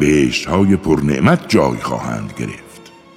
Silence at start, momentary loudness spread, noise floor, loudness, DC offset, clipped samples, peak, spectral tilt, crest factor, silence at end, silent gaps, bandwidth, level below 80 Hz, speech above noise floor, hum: 0 s; 13 LU; -40 dBFS; -16 LUFS; under 0.1%; under 0.1%; 0 dBFS; -6 dB/octave; 16 dB; 0.3 s; none; 15 kHz; -40 dBFS; 25 dB; none